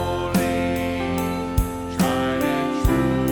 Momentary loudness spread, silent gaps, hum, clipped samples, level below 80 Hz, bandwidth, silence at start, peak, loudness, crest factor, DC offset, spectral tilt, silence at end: 4 LU; none; none; under 0.1%; -32 dBFS; 17.5 kHz; 0 s; -6 dBFS; -22 LUFS; 16 dB; under 0.1%; -6 dB/octave; 0 s